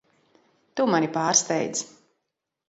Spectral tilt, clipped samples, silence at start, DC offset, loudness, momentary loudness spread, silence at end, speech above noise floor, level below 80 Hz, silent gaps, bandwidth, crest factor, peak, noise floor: -3 dB/octave; under 0.1%; 0.75 s; under 0.1%; -23 LUFS; 14 LU; 0.8 s; 58 dB; -74 dBFS; none; 8.2 kHz; 22 dB; -6 dBFS; -82 dBFS